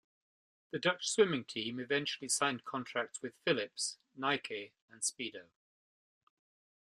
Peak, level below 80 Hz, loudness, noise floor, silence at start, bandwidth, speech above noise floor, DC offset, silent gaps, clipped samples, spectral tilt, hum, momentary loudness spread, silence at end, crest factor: -14 dBFS; -82 dBFS; -36 LUFS; under -90 dBFS; 0.75 s; 13 kHz; over 54 dB; under 0.1%; 4.82-4.88 s; under 0.1%; -2.5 dB/octave; none; 12 LU; 1.45 s; 24 dB